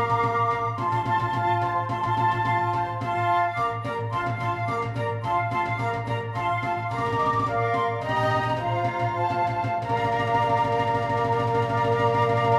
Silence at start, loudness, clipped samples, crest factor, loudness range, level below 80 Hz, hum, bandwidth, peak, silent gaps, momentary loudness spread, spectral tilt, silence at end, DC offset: 0 s; -25 LUFS; under 0.1%; 14 dB; 2 LU; -54 dBFS; none; 12 kHz; -10 dBFS; none; 5 LU; -7 dB/octave; 0 s; under 0.1%